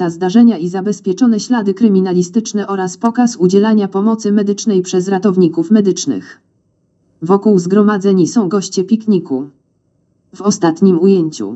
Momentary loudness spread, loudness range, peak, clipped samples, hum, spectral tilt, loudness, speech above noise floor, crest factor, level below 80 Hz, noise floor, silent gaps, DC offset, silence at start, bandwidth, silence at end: 7 LU; 2 LU; 0 dBFS; under 0.1%; none; -6.5 dB/octave; -13 LUFS; 47 dB; 12 dB; -68 dBFS; -60 dBFS; none; under 0.1%; 0 s; 8.2 kHz; 0 s